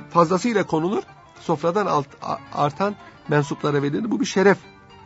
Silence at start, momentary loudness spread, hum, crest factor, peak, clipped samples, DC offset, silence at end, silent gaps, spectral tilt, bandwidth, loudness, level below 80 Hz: 0 s; 10 LU; none; 18 dB; -4 dBFS; under 0.1%; under 0.1%; 0.35 s; none; -6 dB/octave; 8 kHz; -22 LUFS; -60 dBFS